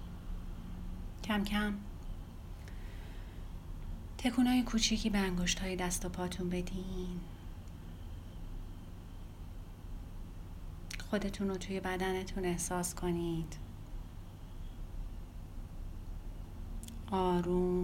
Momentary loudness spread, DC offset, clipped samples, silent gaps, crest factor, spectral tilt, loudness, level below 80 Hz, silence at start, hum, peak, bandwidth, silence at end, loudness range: 17 LU; under 0.1%; under 0.1%; none; 22 dB; -4.5 dB/octave; -37 LUFS; -44 dBFS; 0 s; none; -16 dBFS; 16.5 kHz; 0 s; 15 LU